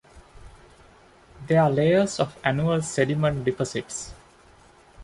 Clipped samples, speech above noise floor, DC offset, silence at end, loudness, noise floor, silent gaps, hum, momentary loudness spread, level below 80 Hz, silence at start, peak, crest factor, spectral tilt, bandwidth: under 0.1%; 31 dB; under 0.1%; 0 s; -24 LUFS; -53 dBFS; none; none; 14 LU; -52 dBFS; 0.15 s; -4 dBFS; 20 dB; -5.5 dB/octave; 11.5 kHz